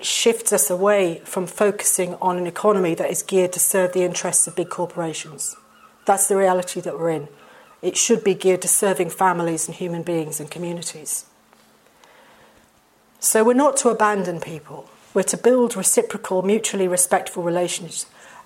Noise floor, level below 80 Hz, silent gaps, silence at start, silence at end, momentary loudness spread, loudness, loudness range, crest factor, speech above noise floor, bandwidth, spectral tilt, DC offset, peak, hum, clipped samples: -57 dBFS; -70 dBFS; none; 0 s; 0.05 s; 11 LU; -20 LUFS; 5 LU; 18 dB; 37 dB; 16.5 kHz; -3 dB/octave; under 0.1%; -2 dBFS; none; under 0.1%